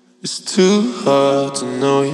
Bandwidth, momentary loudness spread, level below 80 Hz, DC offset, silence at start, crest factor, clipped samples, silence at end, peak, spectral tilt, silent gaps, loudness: 12 kHz; 8 LU; -80 dBFS; under 0.1%; 0.25 s; 16 dB; under 0.1%; 0 s; 0 dBFS; -5 dB/octave; none; -16 LUFS